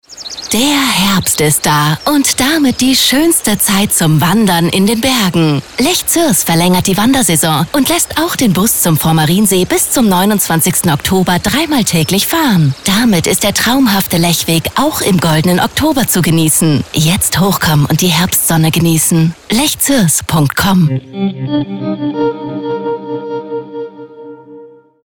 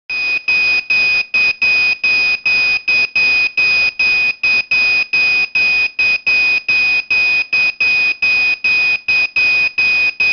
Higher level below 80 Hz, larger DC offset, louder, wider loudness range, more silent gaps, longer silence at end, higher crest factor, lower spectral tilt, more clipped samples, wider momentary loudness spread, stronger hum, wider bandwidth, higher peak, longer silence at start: first, -38 dBFS vs -50 dBFS; neither; about the same, -11 LUFS vs -11 LUFS; first, 3 LU vs 0 LU; neither; first, 0.35 s vs 0 s; about the same, 10 dB vs 8 dB; first, -4 dB/octave vs -0.5 dB/octave; neither; first, 8 LU vs 1 LU; neither; first, 19 kHz vs 6.4 kHz; first, -2 dBFS vs -6 dBFS; about the same, 0.1 s vs 0.1 s